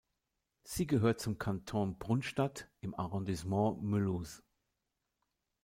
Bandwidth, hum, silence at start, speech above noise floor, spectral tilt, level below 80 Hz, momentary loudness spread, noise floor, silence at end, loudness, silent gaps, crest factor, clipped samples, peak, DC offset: 16.5 kHz; none; 0.65 s; 51 dB; -6.5 dB/octave; -60 dBFS; 12 LU; -86 dBFS; 1.25 s; -36 LUFS; none; 18 dB; under 0.1%; -20 dBFS; under 0.1%